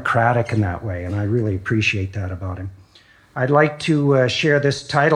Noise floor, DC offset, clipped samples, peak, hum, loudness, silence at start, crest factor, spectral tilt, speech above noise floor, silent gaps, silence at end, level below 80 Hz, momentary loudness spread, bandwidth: -51 dBFS; under 0.1%; under 0.1%; -2 dBFS; none; -19 LUFS; 0 s; 18 dB; -6 dB/octave; 33 dB; none; 0 s; -52 dBFS; 12 LU; 10.5 kHz